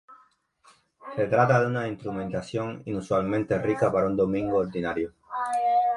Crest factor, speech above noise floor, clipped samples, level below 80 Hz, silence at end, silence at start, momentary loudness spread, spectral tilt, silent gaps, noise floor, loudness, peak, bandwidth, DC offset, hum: 20 dB; 36 dB; under 0.1%; -56 dBFS; 0 s; 0.1 s; 10 LU; -7.5 dB/octave; none; -62 dBFS; -26 LUFS; -6 dBFS; 11.5 kHz; under 0.1%; none